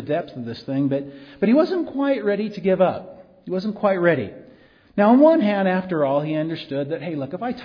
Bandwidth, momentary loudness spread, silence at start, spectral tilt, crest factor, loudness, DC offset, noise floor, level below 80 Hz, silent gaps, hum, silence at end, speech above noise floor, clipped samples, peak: 5.4 kHz; 14 LU; 0 s; -9 dB/octave; 16 dB; -21 LUFS; under 0.1%; -51 dBFS; -62 dBFS; none; none; 0 s; 30 dB; under 0.1%; -4 dBFS